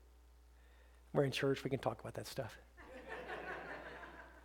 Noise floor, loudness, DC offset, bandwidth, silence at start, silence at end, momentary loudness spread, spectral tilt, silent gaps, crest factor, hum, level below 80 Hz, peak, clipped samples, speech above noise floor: -63 dBFS; -42 LUFS; under 0.1%; 17.5 kHz; 0 s; 0 s; 17 LU; -5.5 dB/octave; none; 22 dB; none; -64 dBFS; -20 dBFS; under 0.1%; 24 dB